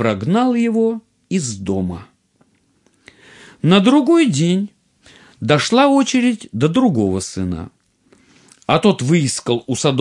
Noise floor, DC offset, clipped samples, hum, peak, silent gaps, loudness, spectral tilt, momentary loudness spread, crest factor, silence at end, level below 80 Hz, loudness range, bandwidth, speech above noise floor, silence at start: -59 dBFS; under 0.1%; under 0.1%; none; -2 dBFS; none; -16 LUFS; -5.5 dB/octave; 13 LU; 16 dB; 0 s; -56 dBFS; 6 LU; 11.5 kHz; 44 dB; 0 s